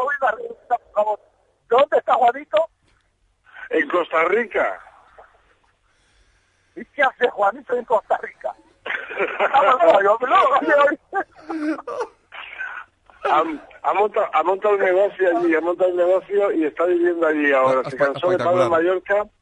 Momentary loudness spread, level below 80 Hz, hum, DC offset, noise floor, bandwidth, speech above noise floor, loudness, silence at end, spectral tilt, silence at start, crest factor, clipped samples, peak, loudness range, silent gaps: 15 LU; -64 dBFS; none; under 0.1%; -64 dBFS; 9.4 kHz; 45 dB; -19 LUFS; 0.15 s; -5.5 dB/octave; 0 s; 18 dB; under 0.1%; -2 dBFS; 6 LU; none